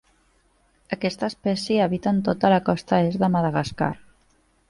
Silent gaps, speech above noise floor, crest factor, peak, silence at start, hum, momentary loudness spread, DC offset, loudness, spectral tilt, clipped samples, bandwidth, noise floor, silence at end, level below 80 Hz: none; 41 dB; 18 dB; -6 dBFS; 0.9 s; none; 8 LU; under 0.1%; -23 LUFS; -7 dB/octave; under 0.1%; 11.5 kHz; -63 dBFS; 0.75 s; -54 dBFS